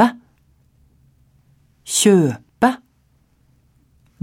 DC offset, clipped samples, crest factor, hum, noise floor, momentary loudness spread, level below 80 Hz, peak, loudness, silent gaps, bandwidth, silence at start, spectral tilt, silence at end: under 0.1%; under 0.1%; 20 dB; none; -59 dBFS; 16 LU; -60 dBFS; -2 dBFS; -17 LUFS; none; 17 kHz; 0 s; -4.5 dB/octave; 1.45 s